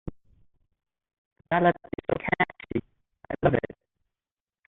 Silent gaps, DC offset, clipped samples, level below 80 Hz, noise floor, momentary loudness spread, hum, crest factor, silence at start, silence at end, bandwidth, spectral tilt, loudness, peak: 1.18-1.36 s; under 0.1%; under 0.1%; -52 dBFS; under -90 dBFS; 14 LU; none; 22 dB; 0.05 s; 1.1 s; 4.1 kHz; -10 dB/octave; -27 LUFS; -8 dBFS